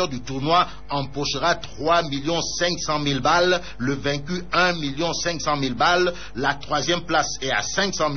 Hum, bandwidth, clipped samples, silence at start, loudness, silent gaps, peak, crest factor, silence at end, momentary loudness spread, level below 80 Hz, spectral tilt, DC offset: none; 6.6 kHz; under 0.1%; 0 s; -22 LUFS; none; -6 dBFS; 16 dB; 0 s; 7 LU; -44 dBFS; -2.5 dB/octave; 2%